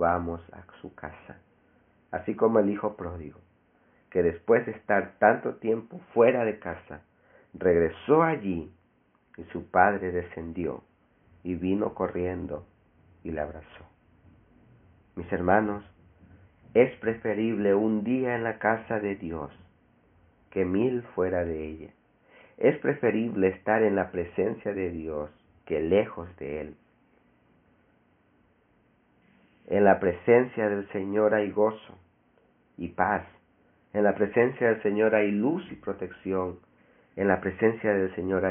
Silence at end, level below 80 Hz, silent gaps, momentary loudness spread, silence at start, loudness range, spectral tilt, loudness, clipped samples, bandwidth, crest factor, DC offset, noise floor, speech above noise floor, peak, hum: 0 s; -58 dBFS; none; 17 LU; 0 s; 7 LU; -2.5 dB/octave; -27 LUFS; under 0.1%; 3.6 kHz; 24 dB; under 0.1%; -66 dBFS; 40 dB; -4 dBFS; none